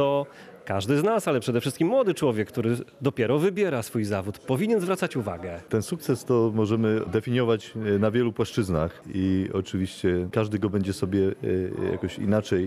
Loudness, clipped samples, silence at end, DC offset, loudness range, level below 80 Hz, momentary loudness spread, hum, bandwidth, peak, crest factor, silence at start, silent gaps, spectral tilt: -26 LUFS; under 0.1%; 0 s; under 0.1%; 2 LU; -54 dBFS; 6 LU; none; 14.5 kHz; -10 dBFS; 16 dB; 0 s; none; -6.5 dB/octave